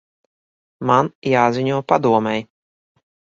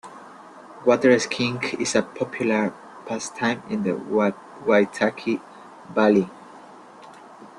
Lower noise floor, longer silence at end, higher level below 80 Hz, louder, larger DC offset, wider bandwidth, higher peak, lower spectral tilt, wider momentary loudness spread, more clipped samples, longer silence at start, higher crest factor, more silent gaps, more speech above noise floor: first, under -90 dBFS vs -45 dBFS; first, 0.9 s vs 0.1 s; first, -60 dBFS vs -66 dBFS; first, -18 LUFS vs -23 LUFS; neither; second, 7.6 kHz vs 11.5 kHz; about the same, 0 dBFS vs -2 dBFS; first, -6.5 dB/octave vs -4.5 dB/octave; second, 8 LU vs 14 LU; neither; first, 0.8 s vs 0.05 s; about the same, 20 dB vs 20 dB; first, 1.15-1.22 s vs none; first, over 73 dB vs 23 dB